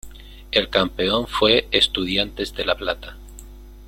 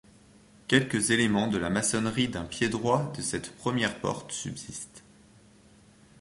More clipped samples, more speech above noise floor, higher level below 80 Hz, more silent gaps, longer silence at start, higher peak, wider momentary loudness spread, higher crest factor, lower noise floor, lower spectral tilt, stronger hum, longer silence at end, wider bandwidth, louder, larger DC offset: neither; second, 19 dB vs 29 dB; first, -40 dBFS vs -56 dBFS; neither; second, 0.05 s vs 0.7 s; first, 0 dBFS vs -6 dBFS; second, 9 LU vs 13 LU; about the same, 22 dB vs 24 dB; second, -40 dBFS vs -57 dBFS; about the same, -4 dB/octave vs -4 dB/octave; neither; second, 0 s vs 1.2 s; first, 16.5 kHz vs 11.5 kHz; first, -20 LUFS vs -28 LUFS; neither